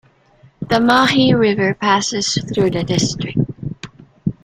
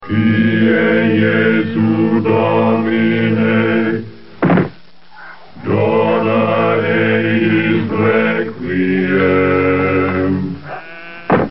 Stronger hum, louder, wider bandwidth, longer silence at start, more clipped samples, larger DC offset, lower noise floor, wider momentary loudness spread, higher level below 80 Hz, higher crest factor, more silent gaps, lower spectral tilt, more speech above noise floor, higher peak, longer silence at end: neither; about the same, -16 LUFS vs -14 LUFS; first, 14 kHz vs 5.8 kHz; first, 0.6 s vs 0 s; neither; second, under 0.1% vs 1%; first, -50 dBFS vs -42 dBFS; first, 17 LU vs 8 LU; first, -46 dBFS vs -52 dBFS; about the same, 16 dB vs 14 dB; neither; about the same, -4.5 dB/octave vs -5.5 dB/octave; first, 35 dB vs 29 dB; about the same, 0 dBFS vs 0 dBFS; about the same, 0.1 s vs 0 s